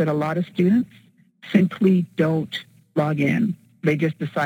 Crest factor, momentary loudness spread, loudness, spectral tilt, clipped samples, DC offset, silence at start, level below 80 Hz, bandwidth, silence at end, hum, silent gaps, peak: 16 dB; 8 LU; -22 LUFS; -8 dB/octave; under 0.1%; under 0.1%; 0 s; -66 dBFS; 11.5 kHz; 0 s; none; none; -4 dBFS